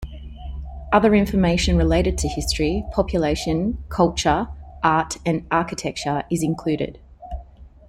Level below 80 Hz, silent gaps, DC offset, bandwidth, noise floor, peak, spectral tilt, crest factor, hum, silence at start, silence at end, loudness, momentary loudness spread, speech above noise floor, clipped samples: -32 dBFS; none; under 0.1%; 15.5 kHz; -43 dBFS; -2 dBFS; -5.5 dB/octave; 18 dB; none; 0 s; 0.2 s; -21 LUFS; 17 LU; 23 dB; under 0.1%